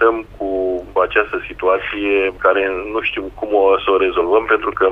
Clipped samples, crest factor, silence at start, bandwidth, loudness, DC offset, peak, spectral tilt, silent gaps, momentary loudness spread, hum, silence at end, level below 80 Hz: under 0.1%; 16 dB; 0 s; 4.3 kHz; -17 LUFS; under 0.1%; 0 dBFS; -6.5 dB/octave; none; 7 LU; none; 0 s; -42 dBFS